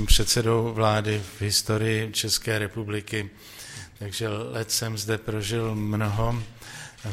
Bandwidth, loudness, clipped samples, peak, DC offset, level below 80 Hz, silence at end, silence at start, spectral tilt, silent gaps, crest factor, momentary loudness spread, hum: 16 kHz; -26 LUFS; under 0.1%; -4 dBFS; under 0.1%; -34 dBFS; 0 s; 0 s; -4 dB/octave; none; 22 dB; 17 LU; none